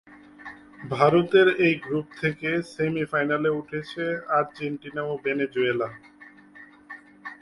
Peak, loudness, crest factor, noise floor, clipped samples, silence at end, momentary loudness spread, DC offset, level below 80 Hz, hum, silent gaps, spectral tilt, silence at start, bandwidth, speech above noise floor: -4 dBFS; -24 LUFS; 20 dB; -50 dBFS; under 0.1%; 0.05 s; 23 LU; under 0.1%; -64 dBFS; none; none; -7 dB/octave; 0.1 s; 11.5 kHz; 25 dB